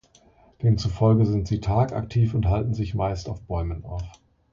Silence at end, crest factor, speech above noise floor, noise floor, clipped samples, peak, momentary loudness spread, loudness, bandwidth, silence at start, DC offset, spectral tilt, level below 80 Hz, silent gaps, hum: 0.4 s; 16 dB; 34 dB; -56 dBFS; under 0.1%; -8 dBFS; 12 LU; -24 LUFS; 7.4 kHz; 0.6 s; under 0.1%; -8.5 dB/octave; -36 dBFS; none; none